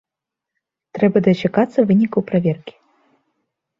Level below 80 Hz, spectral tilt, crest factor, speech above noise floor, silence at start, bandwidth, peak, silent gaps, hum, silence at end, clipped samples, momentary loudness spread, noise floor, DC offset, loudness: -58 dBFS; -9 dB/octave; 18 dB; 69 dB; 0.95 s; 7 kHz; -2 dBFS; none; none; 1.1 s; under 0.1%; 8 LU; -85 dBFS; under 0.1%; -17 LUFS